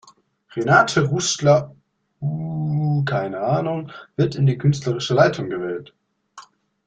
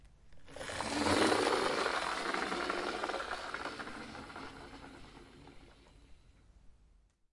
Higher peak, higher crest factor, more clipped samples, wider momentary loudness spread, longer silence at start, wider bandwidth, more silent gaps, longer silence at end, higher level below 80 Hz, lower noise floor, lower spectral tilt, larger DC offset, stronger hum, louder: first, -2 dBFS vs -16 dBFS; about the same, 20 dB vs 22 dB; neither; second, 13 LU vs 24 LU; first, 0.55 s vs 0 s; second, 9.2 kHz vs 11.5 kHz; neither; second, 0.45 s vs 0.6 s; first, -56 dBFS vs -62 dBFS; second, -52 dBFS vs -67 dBFS; first, -5.5 dB/octave vs -3 dB/octave; neither; neither; first, -20 LUFS vs -35 LUFS